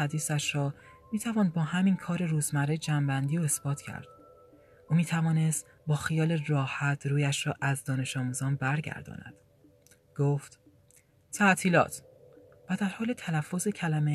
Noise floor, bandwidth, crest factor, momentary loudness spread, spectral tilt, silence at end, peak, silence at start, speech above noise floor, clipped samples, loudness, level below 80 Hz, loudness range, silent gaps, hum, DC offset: -62 dBFS; 14 kHz; 20 dB; 10 LU; -5.5 dB/octave; 0 s; -10 dBFS; 0 s; 34 dB; under 0.1%; -29 LUFS; -66 dBFS; 3 LU; none; none; under 0.1%